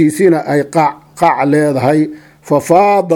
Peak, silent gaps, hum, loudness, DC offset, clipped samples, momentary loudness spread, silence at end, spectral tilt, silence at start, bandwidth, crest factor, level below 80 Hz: 0 dBFS; none; none; -12 LUFS; under 0.1%; under 0.1%; 7 LU; 0 s; -6.5 dB/octave; 0 s; 17.5 kHz; 12 dB; -56 dBFS